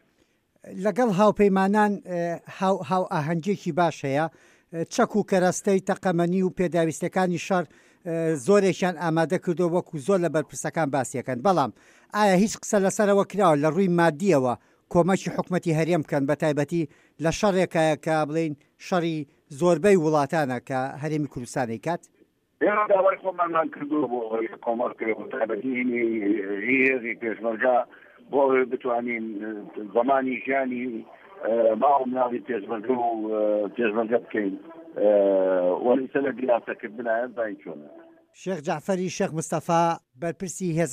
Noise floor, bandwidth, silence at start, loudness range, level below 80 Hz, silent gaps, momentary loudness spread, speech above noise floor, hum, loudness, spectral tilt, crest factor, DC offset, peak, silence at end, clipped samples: -66 dBFS; 15.5 kHz; 0.65 s; 4 LU; -62 dBFS; none; 11 LU; 42 dB; none; -24 LUFS; -6 dB/octave; 18 dB; under 0.1%; -6 dBFS; 0 s; under 0.1%